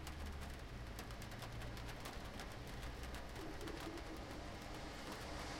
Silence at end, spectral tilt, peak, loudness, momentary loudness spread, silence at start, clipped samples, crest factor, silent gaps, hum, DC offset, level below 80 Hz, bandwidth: 0 s; -4.5 dB/octave; -32 dBFS; -50 LUFS; 2 LU; 0 s; under 0.1%; 16 dB; none; none; under 0.1%; -54 dBFS; 16.5 kHz